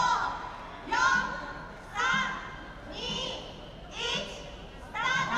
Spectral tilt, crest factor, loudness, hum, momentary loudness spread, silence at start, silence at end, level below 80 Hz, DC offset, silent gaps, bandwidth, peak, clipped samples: -2.5 dB/octave; 20 dB; -31 LUFS; none; 16 LU; 0 s; 0 s; -50 dBFS; under 0.1%; none; 12.5 kHz; -12 dBFS; under 0.1%